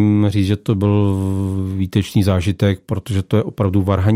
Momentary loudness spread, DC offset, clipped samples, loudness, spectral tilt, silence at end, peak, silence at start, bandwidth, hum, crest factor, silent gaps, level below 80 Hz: 6 LU; under 0.1%; under 0.1%; -18 LUFS; -8 dB/octave; 0 s; -2 dBFS; 0 s; 15 kHz; none; 14 dB; none; -46 dBFS